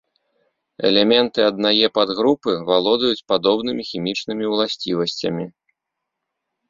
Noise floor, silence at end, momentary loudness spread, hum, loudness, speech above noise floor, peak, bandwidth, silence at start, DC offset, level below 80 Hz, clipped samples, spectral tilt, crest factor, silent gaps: -81 dBFS; 1.2 s; 9 LU; none; -19 LUFS; 62 dB; -2 dBFS; 7.6 kHz; 0.8 s; under 0.1%; -60 dBFS; under 0.1%; -5 dB/octave; 20 dB; none